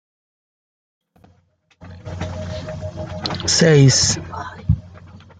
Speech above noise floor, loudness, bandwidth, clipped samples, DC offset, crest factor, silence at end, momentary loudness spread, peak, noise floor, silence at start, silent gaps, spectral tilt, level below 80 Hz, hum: 45 dB; -17 LUFS; 9.6 kHz; under 0.1%; under 0.1%; 20 dB; 0.2 s; 19 LU; -2 dBFS; -59 dBFS; 1.8 s; none; -4 dB/octave; -40 dBFS; none